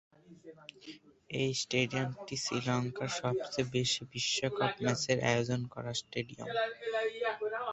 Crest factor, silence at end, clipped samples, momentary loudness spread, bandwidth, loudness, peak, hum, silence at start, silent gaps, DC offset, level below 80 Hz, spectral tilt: 22 dB; 0 s; under 0.1%; 9 LU; 8.2 kHz; -34 LUFS; -12 dBFS; none; 0.3 s; none; under 0.1%; -68 dBFS; -4 dB/octave